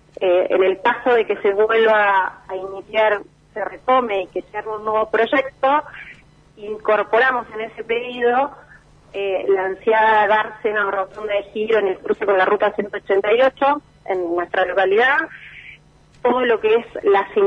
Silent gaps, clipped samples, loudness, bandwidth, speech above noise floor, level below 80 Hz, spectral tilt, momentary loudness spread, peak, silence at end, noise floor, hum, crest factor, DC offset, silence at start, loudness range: none; under 0.1%; -18 LUFS; 6.6 kHz; 31 dB; -56 dBFS; -5.5 dB/octave; 13 LU; -4 dBFS; 0 s; -50 dBFS; none; 14 dB; under 0.1%; 0.2 s; 3 LU